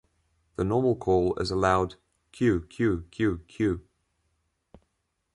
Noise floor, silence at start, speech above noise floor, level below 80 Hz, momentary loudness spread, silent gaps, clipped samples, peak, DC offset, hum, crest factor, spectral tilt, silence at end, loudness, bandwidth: -78 dBFS; 0.6 s; 52 dB; -46 dBFS; 7 LU; none; under 0.1%; -8 dBFS; under 0.1%; none; 20 dB; -7 dB/octave; 1.55 s; -27 LUFS; 11.5 kHz